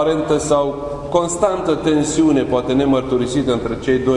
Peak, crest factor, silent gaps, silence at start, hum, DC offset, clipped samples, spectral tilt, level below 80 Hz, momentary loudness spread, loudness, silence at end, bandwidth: -2 dBFS; 16 dB; none; 0 s; none; under 0.1%; under 0.1%; -5.5 dB/octave; -40 dBFS; 5 LU; -17 LUFS; 0 s; 11 kHz